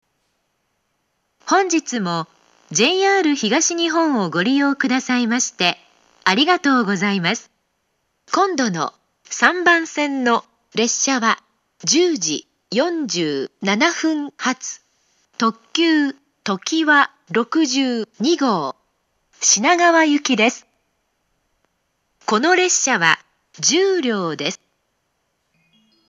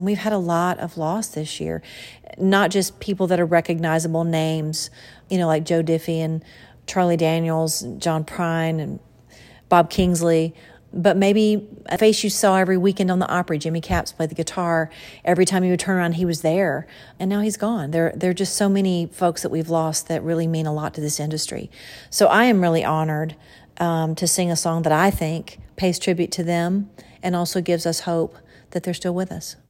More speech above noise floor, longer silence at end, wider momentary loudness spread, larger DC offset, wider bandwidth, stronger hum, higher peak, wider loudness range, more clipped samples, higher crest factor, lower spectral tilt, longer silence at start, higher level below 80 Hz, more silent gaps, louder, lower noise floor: first, 52 dB vs 27 dB; first, 1.55 s vs 0.15 s; about the same, 11 LU vs 11 LU; neither; second, 10 kHz vs 16.5 kHz; neither; about the same, 0 dBFS vs -2 dBFS; about the same, 3 LU vs 4 LU; neither; about the same, 20 dB vs 18 dB; second, -2.5 dB/octave vs -5 dB/octave; first, 1.45 s vs 0 s; second, -78 dBFS vs -48 dBFS; neither; first, -18 LUFS vs -21 LUFS; first, -70 dBFS vs -48 dBFS